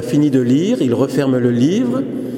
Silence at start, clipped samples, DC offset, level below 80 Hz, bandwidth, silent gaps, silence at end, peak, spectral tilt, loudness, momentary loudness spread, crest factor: 0 s; under 0.1%; under 0.1%; -58 dBFS; 15.5 kHz; none; 0 s; -2 dBFS; -7 dB/octave; -15 LUFS; 3 LU; 12 dB